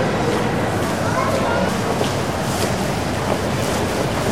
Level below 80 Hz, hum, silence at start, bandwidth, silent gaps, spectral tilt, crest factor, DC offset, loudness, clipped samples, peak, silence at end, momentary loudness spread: -38 dBFS; none; 0 s; 16 kHz; none; -5 dB/octave; 16 dB; 1%; -20 LUFS; under 0.1%; -4 dBFS; 0 s; 2 LU